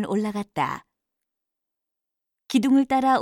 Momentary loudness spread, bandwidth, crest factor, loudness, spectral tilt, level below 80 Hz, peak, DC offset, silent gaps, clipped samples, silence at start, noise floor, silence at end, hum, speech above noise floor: 9 LU; 13.5 kHz; 18 dB; -23 LUFS; -5.5 dB/octave; -64 dBFS; -8 dBFS; under 0.1%; none; under 0.1%; 0 s; -85 dBFS; 0 s; none; 63 dB